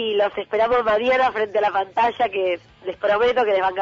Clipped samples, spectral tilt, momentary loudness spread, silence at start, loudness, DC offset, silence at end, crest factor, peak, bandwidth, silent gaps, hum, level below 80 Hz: under 0.1%; -5 dB/octave; 6 LU; 0 s; -20 LUFS; under 0.1%; 0 s; 10 dB; -10 dBFS; 7.4 kHz; none; none; -54 dBFS